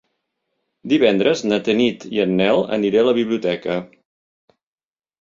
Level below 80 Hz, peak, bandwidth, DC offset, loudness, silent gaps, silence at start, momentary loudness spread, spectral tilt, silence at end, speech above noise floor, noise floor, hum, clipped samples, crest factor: -60 dBFS; -2 dBFS; 7.6 kHz; under 0.1%; -18 LUFS; none; 0.85 s; 7 LU; -5.5 dB/octave; 1.35 s; 57 dB; -74 dBFS; none; under 0.1%; 18 dB